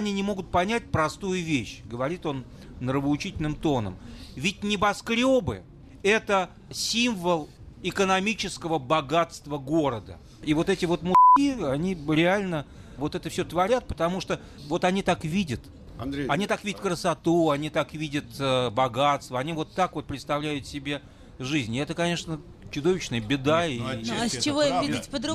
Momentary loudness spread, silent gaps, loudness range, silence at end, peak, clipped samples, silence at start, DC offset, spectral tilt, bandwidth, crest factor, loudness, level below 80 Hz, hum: 11 LU; none; 6 LU; 0 s; -8 dBFS; under 0.1%; 0 s; under 0.1%; -5 dB/octave; 14.5 kHz; 18 dB; -26 LUFS; -48 dBFS; none